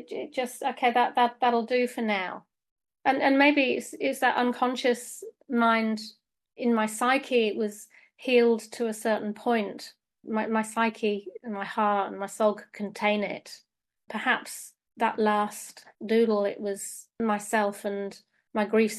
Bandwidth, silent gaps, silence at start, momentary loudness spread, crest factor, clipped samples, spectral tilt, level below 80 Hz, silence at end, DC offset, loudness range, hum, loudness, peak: 13 kHz; 2.71-2.76 s; 0 s; 14 LU; 20 dB; under 0.1%; -4 dB/octave; -76 dBFS; 0 s; under 0.1%; 4 LU; none; -27 LUFS; -8 dBFS